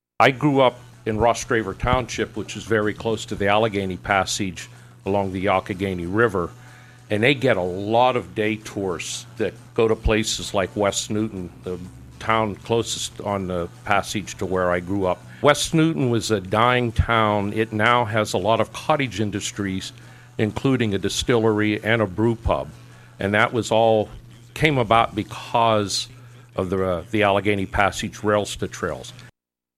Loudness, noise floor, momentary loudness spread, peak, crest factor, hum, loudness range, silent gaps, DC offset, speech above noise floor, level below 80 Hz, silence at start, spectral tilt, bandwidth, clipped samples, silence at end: -22 LUFS; -57 dBFS; 10 LU; -2 dBFS; 20 dB; none; 4 LU; none; under 0.1%; 36 dB; -40 dBFS; 0.2 s; -5 dB/octave; 15.5 kHz; under 0.1%; 0.5 s